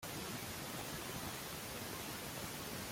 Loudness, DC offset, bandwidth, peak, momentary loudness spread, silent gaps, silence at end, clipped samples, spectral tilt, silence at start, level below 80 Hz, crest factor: -44 LUFS; under 0.1%; 16.5 kHz; -32 dBFS; 1 LU; none; 0 s; under 0.1%; -3 dB/octave; 0 s; -64 dBFS; 14 dB